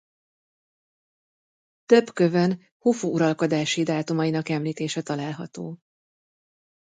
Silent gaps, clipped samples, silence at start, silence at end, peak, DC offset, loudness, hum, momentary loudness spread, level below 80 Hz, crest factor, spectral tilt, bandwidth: 2.71-2.80 s; under 0.1%; 1.9 s; 1.05 s; -4 dBFS; under 0.1%; -24 LUFS; none; 13 LU; -72 dBFS; 22 dB; -5.5 dB/octave; 9.4 kHz